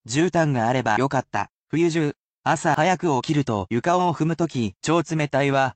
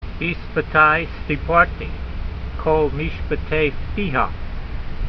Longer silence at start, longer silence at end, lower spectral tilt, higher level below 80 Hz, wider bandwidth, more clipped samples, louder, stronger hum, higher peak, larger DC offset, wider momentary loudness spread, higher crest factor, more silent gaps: about the same, 0.05 s vs 0 s; about the same, 0.05 s vs 0 s; second, -6 dB/octave vs -8.5 dB/octave; second, -58 dBFS vs -28 dBFS; first, 9 kHz vs 6 kHz; neither; about the same, -22 LUFS vs -20 LUFS; neither; second, -6 dBFS vs 0 dBFS; neither; second, 6 LU vs 15 LU; second, 14 dB vs 20 dB; first, 1.53-1.64 s, 2.16-2.44 s vs none